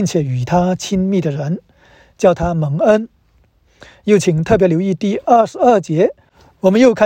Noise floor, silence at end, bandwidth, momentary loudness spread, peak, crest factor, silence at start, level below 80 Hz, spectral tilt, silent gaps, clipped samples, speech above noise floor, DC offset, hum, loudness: -55 dBFS; 0 s; 16 kHz; 7 LU; 0 dBFS; 14 dB; 0 s; -42 dBFS; -6.5 dB/octave; none; under 0.1%; 41 dB; under 0.1%; none; -15 LUFS